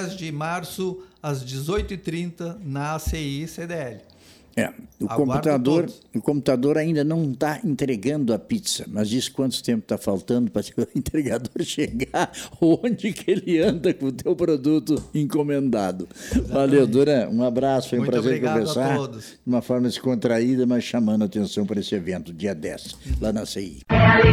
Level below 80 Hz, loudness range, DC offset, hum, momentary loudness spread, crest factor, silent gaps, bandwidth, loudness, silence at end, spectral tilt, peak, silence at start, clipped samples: -42 dBFS; 7 LU; under 0.1%; none; 10 LU; 20 dB; none; 16 kHz; -23 LUFS; 0 s; -6 dB/octave; -2 dBFS; 0 s; under 0.1%